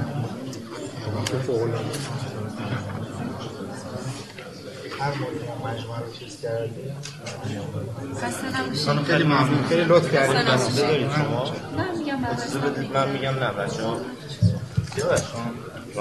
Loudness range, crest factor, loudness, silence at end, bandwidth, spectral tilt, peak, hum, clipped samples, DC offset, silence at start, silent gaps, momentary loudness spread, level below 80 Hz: 11 LU; 20 dB; -25 LUFS; 0 s; 12.5 kHz; -5.5 dB/octave; -6 dBFS; none; under 0.1%; 0.1%; 0 s; none; 15 LU; -54 dBFS